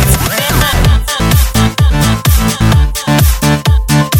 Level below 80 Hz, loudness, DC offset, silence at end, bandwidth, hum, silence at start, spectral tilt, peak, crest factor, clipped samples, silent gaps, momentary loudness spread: -14 dBFS; -10 LUFS; under 0.1%; 0 s; 17.5 kHz; none; 0 s; -4.5 dB/octave; 0 dBFS; 10 dB; under 0.1%; none; 2 LU